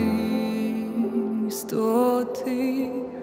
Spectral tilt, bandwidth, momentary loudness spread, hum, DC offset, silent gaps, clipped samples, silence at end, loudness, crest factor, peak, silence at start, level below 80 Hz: -6 dB/octave; 16 kHz; 6 LU; none; under 0.1%; none; under 0.1%; 0 s; -25 LUFS; 14 dB; -10 dBFS; 0 s; -60 dBFS